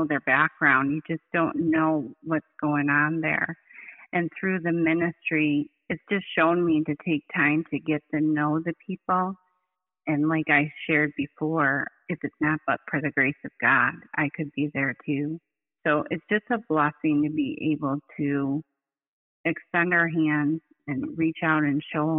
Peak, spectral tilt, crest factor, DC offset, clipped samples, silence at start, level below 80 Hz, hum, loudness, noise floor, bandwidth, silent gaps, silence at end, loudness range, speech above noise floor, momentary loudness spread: -8 dBFS; -5 dB/octave; 18 dB; under 0.1%; under 0.1%; 0 s; -68 dBFS; none; -25 LUFS; -80 dBFS; 3.9 kHz; 19.08-19.44 s; 0 s; 2 LU; 55 dB; 9 LU